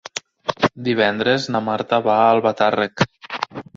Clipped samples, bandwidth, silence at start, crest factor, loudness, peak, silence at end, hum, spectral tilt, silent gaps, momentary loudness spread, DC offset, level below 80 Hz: under 0.1%; 8 kHz; 0.15 s; 18 dB; -19 LUFS; -2 dBFS; 0.15 s; none; -5 dB/octave; none; 12 LU; under 0.1%; -56 dBFS